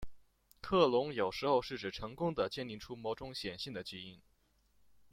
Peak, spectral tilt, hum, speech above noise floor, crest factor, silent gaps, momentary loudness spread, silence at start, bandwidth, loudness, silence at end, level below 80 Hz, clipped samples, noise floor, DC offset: -16 dBFS; -5.5 dB/octave; none; 37 dB; 22 dB; none; 14 LU; 0 s; 16 kHz; -36 LUFS; 0.05 s; -60 dBFS; under 0.1%; -73 dBFS; under 0.1%